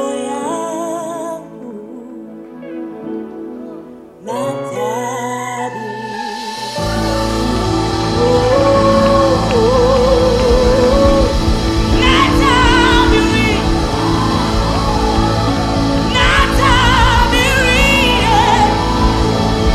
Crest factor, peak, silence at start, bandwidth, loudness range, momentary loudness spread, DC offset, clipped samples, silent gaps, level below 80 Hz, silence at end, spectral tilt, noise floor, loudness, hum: 12 dB; 0 dBFS; 0 s; 14 kHz; 13 LU; 17 LU; under 0.1%; under 0.1%; none; -22 dBFS; 0 s; -5 dB/octave; -34 dBFS; -13 LUFS; none